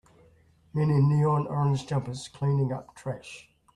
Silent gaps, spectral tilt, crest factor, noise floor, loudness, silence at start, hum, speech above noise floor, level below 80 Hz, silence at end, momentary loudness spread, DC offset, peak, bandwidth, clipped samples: none; -8 dB/octave; 14 dB; -60 dBFS; -27 LUFS; 0.75 s; none; 34 dB; -58 dBFS; 0.35 s; 15 LU; under 0.1%; -12 dBFS; 10.5 kHz; under 0.1%